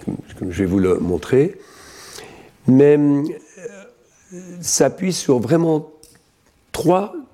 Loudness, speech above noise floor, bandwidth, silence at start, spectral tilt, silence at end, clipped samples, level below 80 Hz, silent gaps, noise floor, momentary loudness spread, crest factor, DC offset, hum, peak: -18 LUFS; 41 dB; 16 kHz; 0 s; -5.5 dB/octave; 0.1 s; under 0.1%; -50 dBFS; none; -58 dBFS; 23 LU; 16 dB; under 0.1%; none; -2 dBFS